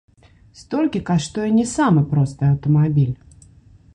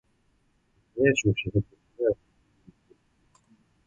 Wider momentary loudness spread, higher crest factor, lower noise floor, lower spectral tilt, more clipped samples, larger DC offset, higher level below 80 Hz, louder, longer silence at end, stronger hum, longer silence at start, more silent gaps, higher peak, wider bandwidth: second, 6 LU vs 16 LU; second, 14 dB vs 22 dB; second, -48 dBFS vs -68 dBFS; first, -7 dB/octave vs -5.5 dB/octave; neither; neither; first, -46 dBFS vs -52 dBFS; first, -19 LUFS vs -26 LUFS; second, 0.8 s vs 1.75 s; neither; second, 0.6 s vs 0.95 s; neither; about the same, -6 dBFS vs -8 dBFS; first, 10.5 kHz vs 8 kHz